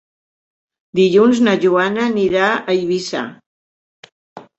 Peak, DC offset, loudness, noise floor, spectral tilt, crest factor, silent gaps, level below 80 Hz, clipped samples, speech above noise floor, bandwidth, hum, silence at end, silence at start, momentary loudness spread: 0 dBFS; under 0.1%; -15 LUFS; under -90 dBFS; -5.5 dB/octave; 16 dB; 3.46-4.03 s, 4.12-4.36 s; -58 dBFS; under 0.1%; over 75 dB; 8.2 kHz; none; 0.2 s; 0.95 s; 12 LU